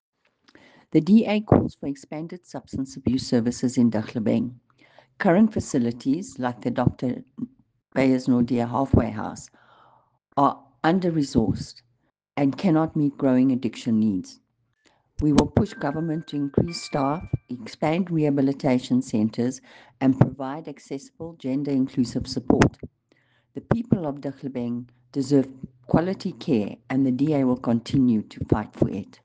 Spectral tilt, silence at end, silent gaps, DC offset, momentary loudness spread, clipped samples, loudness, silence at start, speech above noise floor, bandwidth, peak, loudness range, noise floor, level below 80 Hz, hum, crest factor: -7 dB/octave; 0.2 s; none; under 0.1%; 14 LU; under 0.1%; -24 LUFS; 0.95 s; 47 dB; 9.4 kHz; -2 dBFS; 3 LU; -70 dBFS; -46 dBFS; none; 22 dB